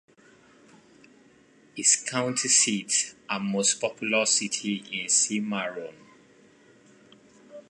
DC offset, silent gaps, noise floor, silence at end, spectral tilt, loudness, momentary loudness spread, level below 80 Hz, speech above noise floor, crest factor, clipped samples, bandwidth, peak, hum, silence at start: under 0.1%; none; -58 dBFS; 0.1 s; -1.5 dB/octave; -24 LUFS; 11 LU; -76 dBFS; 32 dB; 22 dB; under 0.1%; 11.5 kHz; -6 dBFS; none; 1.75 s